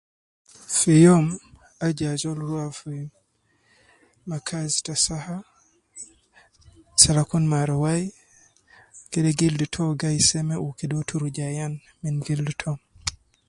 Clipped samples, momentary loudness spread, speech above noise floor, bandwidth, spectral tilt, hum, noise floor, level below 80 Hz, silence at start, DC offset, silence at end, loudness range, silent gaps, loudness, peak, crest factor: under 0.1%; 19 LU; 44 dB; 11.5 kHz; -4.5 dB/octave; none; -66 dBFS; -52 dBFS; 0.7 s; under 0.1%; 0.35 s; 7 LU; none; -23 LUFS; 0 dBFS; 24 dB